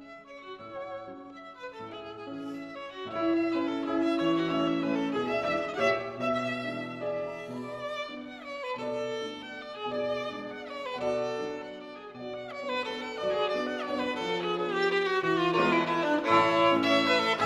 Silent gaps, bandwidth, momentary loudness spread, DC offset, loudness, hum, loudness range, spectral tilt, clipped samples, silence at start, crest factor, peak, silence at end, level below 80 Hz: none; 11.5 kHz; 17 LU; under 0.1%; -30 LUFS; none; 9 LU; -5 dB/octave; under 0.1%; 0 s; 20 dB; -12 dBFS; 0 s; -66 dBFS